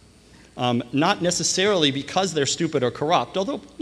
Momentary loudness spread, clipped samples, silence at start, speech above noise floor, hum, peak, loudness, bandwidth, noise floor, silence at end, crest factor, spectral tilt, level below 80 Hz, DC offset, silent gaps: 7 LU; under 0.1%; 0.55 s; 28 dB; none; -4 dBFS; -22 LUFS; 13 kHz; -50 dBFS; 0.15 s; 18 dB; -3.5 dB/octave; -56 dBFS; under 0.1%; none